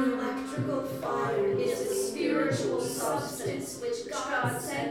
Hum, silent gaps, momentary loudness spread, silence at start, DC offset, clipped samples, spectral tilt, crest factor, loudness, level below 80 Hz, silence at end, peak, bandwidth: none; none; 6 LU; 0 s; under 0.1%; under 0.1%; -4.5 dB/octave; 14 dB; -30 LUFS; -64 dBFS; 0 s; -16 dBFS; 18 kHz